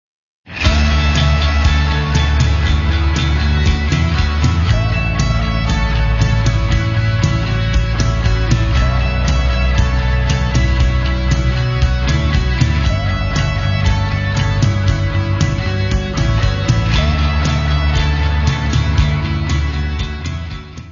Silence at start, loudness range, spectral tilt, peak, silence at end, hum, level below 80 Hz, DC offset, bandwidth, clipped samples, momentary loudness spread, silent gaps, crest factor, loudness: 0.45 s; 1 LU; -5.5 dB/octave; 0 dBFS; 0 s; none; -18 dBFS; 0.2%; 7.4 kHz; under 0.1%; 3 LU; none; 14 dB; -16 LUFS